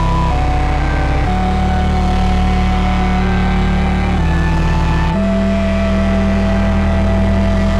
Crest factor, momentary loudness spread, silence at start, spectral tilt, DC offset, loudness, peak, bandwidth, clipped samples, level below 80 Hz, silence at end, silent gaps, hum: 6 dB; 2 LU; 0 s; -7.5 dB/octave; 2%; -15 LUFS; -6 dBFS; 9.8 kHz; under 0.1%; -16 dBFS; 0 s; none; none